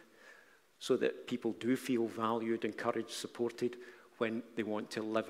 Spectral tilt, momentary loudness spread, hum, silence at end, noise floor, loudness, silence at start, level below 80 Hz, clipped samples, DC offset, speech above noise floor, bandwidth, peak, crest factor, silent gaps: -5 dB/octave; 6 LU; none; 0 s; -63 dBFS; -37 LUFS; 0.25 s; -86 dBFS; under 0.1%; under 0.1%; 27 dB; 16 kHz; -18 dBFS; 20 dB; none